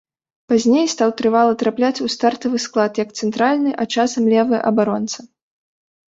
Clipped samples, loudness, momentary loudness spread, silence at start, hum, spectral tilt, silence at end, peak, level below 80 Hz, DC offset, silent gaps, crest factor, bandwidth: under 0.1%; -18 LUFS; 6 LU; 0.5 s; none; -4.5 dB/octave; 0.9 s; -2 dBFS; -62 dBFS; under 0.1%; none; 16 dB; 8 kHz